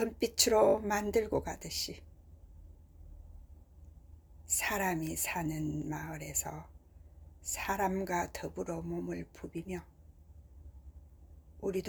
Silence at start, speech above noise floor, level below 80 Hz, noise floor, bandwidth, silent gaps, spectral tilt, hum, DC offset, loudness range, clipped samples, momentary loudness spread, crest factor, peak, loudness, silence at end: 0 s; 22 dB; -54 dBFS; -56 dBFS; over 20 kHz; none; -3.5 dB/octave; none; under 0.1%; 9 LU; under 0.1%; 26 LU; 28 dB; -8 dBFS; -34 LUFS; 0 s